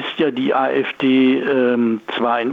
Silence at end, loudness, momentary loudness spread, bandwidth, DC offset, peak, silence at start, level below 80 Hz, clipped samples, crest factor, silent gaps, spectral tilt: 0 s; -17 LUFS; 5 LU; 4.6 kHz; under 0.1%; -6 dBFS; 0 s; -66 dBFS; under 0.1%; 12 dB; none; -7 dB/octave